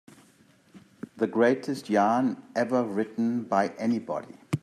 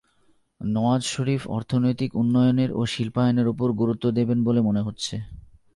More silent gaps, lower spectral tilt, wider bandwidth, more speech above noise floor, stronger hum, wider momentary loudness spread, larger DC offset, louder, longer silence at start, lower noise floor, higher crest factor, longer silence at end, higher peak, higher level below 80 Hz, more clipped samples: neither; about the same, -6.5 dB/octave vs -6.5 dB/octave; first, 13 kHz vs 11.5 kHz; second, 34 dB vs 40 dB; neither; first, 11 LU vs 8 LU; neither; second, -27 LUFS vs -23 LUFS; first, 0.75 s vs 0.6 s; about the same, -60 dBFS vs -62 dBFS; about the same, 18 dB vs 14 dB; second, 0.05 s vs 0.35 s; about the same, -10 dBFS vs -10 dBFS; second, -74 dBFS vs -52 dBFS; neither